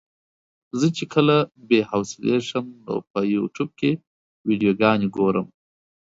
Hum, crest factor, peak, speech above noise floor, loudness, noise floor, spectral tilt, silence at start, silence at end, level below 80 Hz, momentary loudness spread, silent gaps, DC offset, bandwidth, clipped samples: none; 20 dB; -4 dBFS; over 69 dB; -22 LUFS; under -90 dBFS; -6 dB/octave; 0.75 s; 0.7 s; -62 dBFS; 11 LU; 3.10-3.14 s, 4.07-4.44 s; under 0.1%; 7.8 kHz; under 0.1%